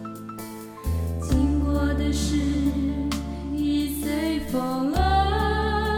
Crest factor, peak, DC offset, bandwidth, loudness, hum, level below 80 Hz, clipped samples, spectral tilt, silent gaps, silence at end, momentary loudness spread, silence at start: 16 dB; -8 dBFS; under 0.1%; 17.5 kHz; -25 LUFS; none; -30 dBFS; under 0.1%; -6 dB/octave; none; 0 s; 11 LU; 0 s